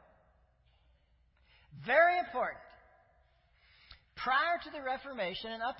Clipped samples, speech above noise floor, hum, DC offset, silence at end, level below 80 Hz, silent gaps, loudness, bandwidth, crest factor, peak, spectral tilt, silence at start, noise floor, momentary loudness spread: under 0.1%; 37 dB; none; under 0.1%; 0 s; -68 dBFS; none; -32 LUFS; 5.6 kHz; 22 dB; -14 dBFS; -0.5 dB/octave; 1.7 s; -69 dBFS; 16 LU